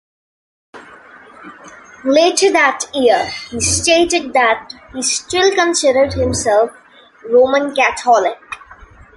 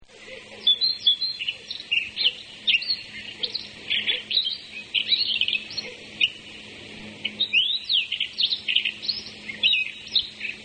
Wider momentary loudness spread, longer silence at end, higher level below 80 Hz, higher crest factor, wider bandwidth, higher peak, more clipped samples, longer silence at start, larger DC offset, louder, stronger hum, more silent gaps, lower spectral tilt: second, 9 LU vs 16 LU; first, 0.6 s vs 0 s; first, -40 dBFS vs -64 dBFS; about the same, 16 dB vs 20 dB; first, 11.5 kHz vs 9.4 kHz; first, 0 dBFS vs -6 dBFS; neither; first, 0.75 s vs 0 s; neither; first, -14 LUFS vs -23 LUFS; neither; neither; first, -2.5 dB/octave vs -0.5 dB/octave